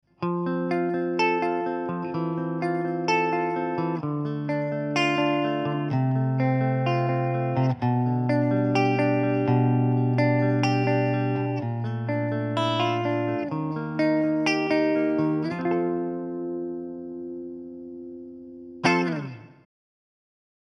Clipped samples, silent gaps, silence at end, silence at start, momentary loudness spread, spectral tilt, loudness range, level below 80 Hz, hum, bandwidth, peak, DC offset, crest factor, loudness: under 0.1%; none; 1.2 s; 0.2 s; 12 LU; -7.5 dB/octave; 8 LU; -68 dBFS; 50 Hz at -65 dBFS; 9.6 kHz; -6 dBFS; under 0.1%; 18 dB; -25 LUFS